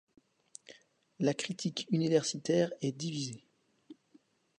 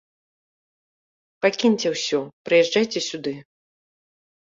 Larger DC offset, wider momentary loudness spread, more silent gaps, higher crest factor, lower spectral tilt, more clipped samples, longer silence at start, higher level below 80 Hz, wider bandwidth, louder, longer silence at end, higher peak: neither; first, 22 LU vs 12 LU; second, none vs 2.33-2.45 s; about the same, 20 dB vs 18 dB; first, -5 dB/octave vs -3.5 dB/octave; neither; second, 0.7 s vs 1.4 s; second, -80 dBFS vs -70 dBFS; first, 11 kHz vs 7.8 kHz; second, -33 LUFS vs -22 LUFS; second, 0.65 s vs 1.05 s; second, -16 dBFS vs -6 dBFS